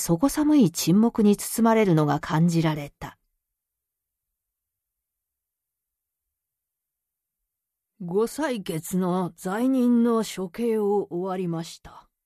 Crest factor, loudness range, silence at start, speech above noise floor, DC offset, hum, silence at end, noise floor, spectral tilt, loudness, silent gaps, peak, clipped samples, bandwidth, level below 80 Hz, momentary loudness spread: 18 dB; 11 LU; 0 s; 63 dB; under 0.1%; none; 0.25 s; -86 dBFS; -6 dB/octave; -23 LUFS; none; -8 dBFS; under 0.1%; 14 kHz; -58 dBFS; 11 LU